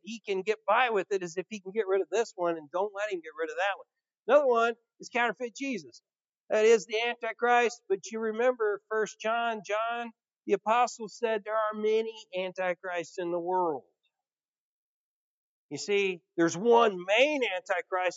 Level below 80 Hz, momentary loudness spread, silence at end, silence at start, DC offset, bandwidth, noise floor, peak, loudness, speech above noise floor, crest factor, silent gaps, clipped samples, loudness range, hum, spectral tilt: under -90 dBFS; 12 LU; 0 s; 0.05 s; under 0.1%; 8 kHz; under -90 dBFS; -10 dBFS; -29 LUFS; over 61 dB; 20 dB; 4.19-4.23 s, 6.29-6.44 s, 10.36-10.40 s, 14.48-15.69 s; under 0.1%; 6 LU; none; -3.5 dB/octave